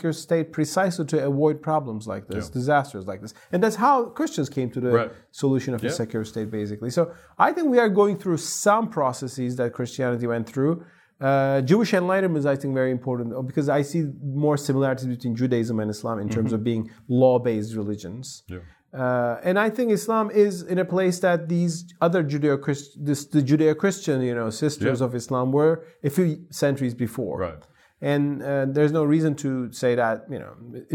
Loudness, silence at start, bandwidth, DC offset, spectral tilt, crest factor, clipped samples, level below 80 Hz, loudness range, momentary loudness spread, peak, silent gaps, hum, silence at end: -24 LUFS; 0 s; 17 kHz; under 0.1%; -6.5 dB/octave; 20 dB; under 0.1%; -64 dBFS; 2 LU; 10 LU; -4 dBFS; none; none; 0 s